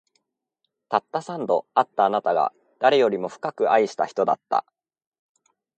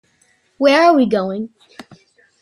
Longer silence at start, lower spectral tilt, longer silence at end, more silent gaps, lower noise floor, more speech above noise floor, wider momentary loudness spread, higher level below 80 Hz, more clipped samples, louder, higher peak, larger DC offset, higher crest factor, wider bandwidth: first, 0.9 s vs 0.6 s; about the same, -5 dB/octave vs -5.5 dB/octave; first, 1.15 s vs 0.6 s; neither; first, -79 dBFS vs -59 dBFS; first, 57 dB vs 45 dB; second, 7 LU vs 16 LU; second, -76 dBFS vs -64 dBFS; neither; second, -23 LUFS vs -14 LUFS; about the same, -4 dBFS vs -2 dBFS; neither; about the same, 20 dB vs 16 dB; second, 9 kHz vs 15 kHz